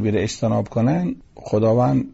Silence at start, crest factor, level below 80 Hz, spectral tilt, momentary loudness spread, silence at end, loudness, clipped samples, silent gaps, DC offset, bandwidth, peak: 0 s; 10 dB; -48 dBFS; -7.5 dB/octave; 8 LU; 0.05 s; -20 LUFS; under 0.1%; none; under 0.1%; 8 kHz; -8 dBFS